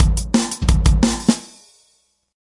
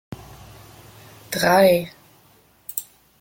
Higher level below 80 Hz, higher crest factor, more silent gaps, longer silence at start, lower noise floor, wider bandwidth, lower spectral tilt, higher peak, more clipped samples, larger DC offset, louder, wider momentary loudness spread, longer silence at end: first, -22 dBFS vs -56 dBFS; about the same, 18 dB vs 20 dB; neither; about the same, 0 s vs 0.1 s; first, -62 dBFS vs -56 dBFS; second, 11.5 kHz vs 17 kHz; about the same, -5 dB/octave vs -4.5 dB/octave; first, 0 dBFS vs -4 dBFS; neither; neither; about the same, -18 LUFS vs -20 LUFS; second, 4 LU vs 24 LU; first, 1.1 s vs 0.4 s